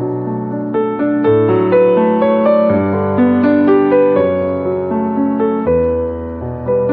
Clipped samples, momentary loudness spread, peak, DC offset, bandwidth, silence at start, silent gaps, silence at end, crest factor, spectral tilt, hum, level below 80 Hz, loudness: under 0.1%; 9 LU; 0 dBFS; under 0.1%; 4.8 kHz; 0 s; none; 0 s; 12 dB; -11.5 dB/octave; none; -40 dBFS; -14 LUFS